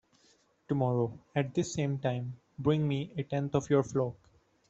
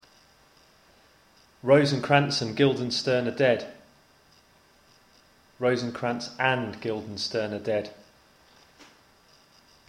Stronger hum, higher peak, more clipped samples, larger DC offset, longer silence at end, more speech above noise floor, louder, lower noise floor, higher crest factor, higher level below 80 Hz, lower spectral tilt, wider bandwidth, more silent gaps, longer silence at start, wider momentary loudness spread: neither; second, -12 dBFS vs -4 dBFS; neither; neither; second, 0.55 s vs 1.95 s; about the same, 37 dB vs 35 dB; second, -32 LUFS vs -26 LUFS; first, -67 dBFS vs -60 dBFS; about the same, 20 dB vs 24 dB; about the same, -64 dBFS vs -66 dBFS; first, -7 dB/octave vs -5.5 dB/octave; second, 8 kHz vs 12 kHz; neither; second, 0.7 s vs 1.65 s; second, 7 LU vs 11 LU